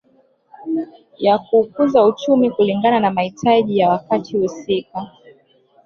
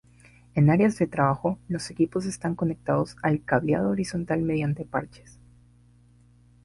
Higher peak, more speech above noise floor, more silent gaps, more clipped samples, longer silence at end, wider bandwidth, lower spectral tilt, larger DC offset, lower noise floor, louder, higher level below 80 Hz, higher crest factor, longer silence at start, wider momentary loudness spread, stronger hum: first, -2 dBFS vs -8 dBFS; first, 40 dB vs 32 dB; neither; neither; second, 0.75 s vs 1.55 s; second, 7 kHz vs 11.5 kHz; about the same, -6.5 dB/octave vs -7.5 dB/octave; neither; about the same, -57 dBFS vs -57 dBFS; first, -17 LUFS vs -26 LUFS; second, -60 dBFS vs -54 dBFS; about the same, 16 dB vs 20 dB; about the same, 0.6 s vs 0.55 s; about the same, 12 LU vs 10 LU; second, none vs 60 Hz at -45 dBFS